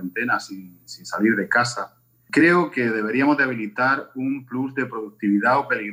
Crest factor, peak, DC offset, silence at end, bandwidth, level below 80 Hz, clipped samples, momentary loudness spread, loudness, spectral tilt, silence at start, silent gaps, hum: 16 dB; -6 dBFS; under 0.1%; 0 s; 15.5 kHz; -74 dBFS; under 0.1%; 14 LU; -21 LUFS; -5.5 dB/octave; 0 s; none; none